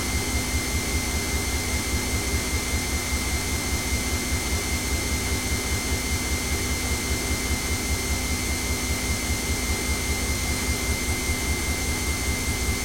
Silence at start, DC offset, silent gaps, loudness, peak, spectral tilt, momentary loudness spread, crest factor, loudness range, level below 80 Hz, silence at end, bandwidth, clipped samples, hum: 0 s; under 0.1%; none; -25 LUFS; -12 dBFS; -3 dB/octave; 0 LU; 14 dB; 0 LU; -30 dBFS; 0 s; 16.5 kHz; under 0.1%; none